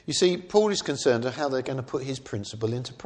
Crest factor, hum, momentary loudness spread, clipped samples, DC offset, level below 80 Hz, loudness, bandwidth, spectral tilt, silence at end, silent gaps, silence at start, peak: 20 dB; none; 9 LU; under 0.1%; under 0.1%; -62 dBFS; -26 LUFS; 10 kHz; -4.5 dB/octave; 0 s; none; 0.05 s; -6 dBFS